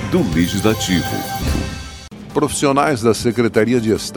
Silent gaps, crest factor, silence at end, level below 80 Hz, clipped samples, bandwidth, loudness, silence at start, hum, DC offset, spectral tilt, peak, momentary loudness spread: none; 16 dB; 0 s; -32 dBFS; under 0.1%; 19.5 kHz; -17 LUFS; 0 s; none; under 0.1%; -5 dB/octave; 0 dBFS; 10 LU